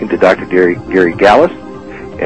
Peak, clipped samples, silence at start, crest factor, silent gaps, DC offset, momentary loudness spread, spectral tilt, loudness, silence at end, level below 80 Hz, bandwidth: 0 dBFS; 0.9%; 0 s; 12 dB; none; 0.8%; 20 LU; -6.5 dB/octave; -10 LUFS; 0 s; -40 dBFS; 8.8 kHz